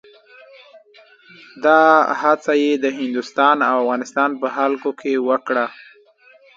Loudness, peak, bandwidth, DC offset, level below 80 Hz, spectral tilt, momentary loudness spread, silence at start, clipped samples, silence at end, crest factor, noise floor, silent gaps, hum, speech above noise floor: -17 LUFS; 0 dBFS; 7.8 kHz; under 0.1%; -74 dBFS; -4 dB/octave; 8 LU; 1.55 s; under 0.1%; 0.85 s; 18 dB; -51 dBFS; none; none; 34 dB